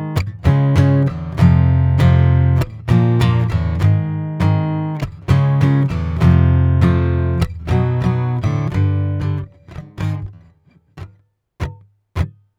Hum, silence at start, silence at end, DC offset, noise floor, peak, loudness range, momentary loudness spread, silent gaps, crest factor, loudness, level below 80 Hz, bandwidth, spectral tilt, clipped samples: none; 0 s; 0.3 s; under 0.1%; -53 dBFS; 0 dBFS; 9 LU; 12 LU; none; 14 dB; -16 LUFS; -30 dBFS; 7.8 kHz; -8.5 dB/octave; under 0.1%